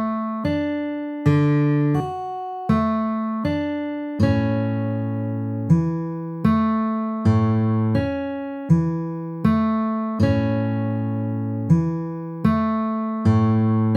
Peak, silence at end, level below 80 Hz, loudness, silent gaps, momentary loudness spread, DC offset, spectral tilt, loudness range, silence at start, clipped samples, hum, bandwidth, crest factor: -6 dBFS; 0 s; -46 dBFS; -22 LUFS; none; 8 LU; under 0.1%; -9.5 dB/octave; 2 LU; 0 s; under 0.1%; none; 7 kHz; 16 dB